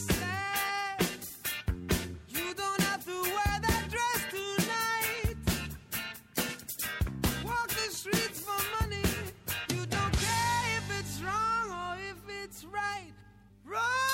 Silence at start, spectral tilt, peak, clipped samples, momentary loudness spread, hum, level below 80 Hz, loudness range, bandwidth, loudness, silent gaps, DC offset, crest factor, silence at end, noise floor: 0 s; -3.5 dB/octave; -14 dBFS; under 0.1%; 7 LU; none; -44 dBFS; 2 LU; 16.5 kHz; -32 LUFS; none; under 0.1%; 20 dB; 0 s; -56 dBFS